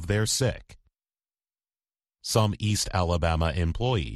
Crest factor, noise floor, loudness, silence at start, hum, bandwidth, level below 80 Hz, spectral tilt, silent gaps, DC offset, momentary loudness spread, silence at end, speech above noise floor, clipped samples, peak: 18 dB; under -90 dBFS; -26 LUFS; 0 s; none; 12.5 kHz; -38 dBFS; -4.5 dB/octave; none; under 0.1%; 4 LU; 0 s; over 65 dB; under 0.1%; -8 dBFS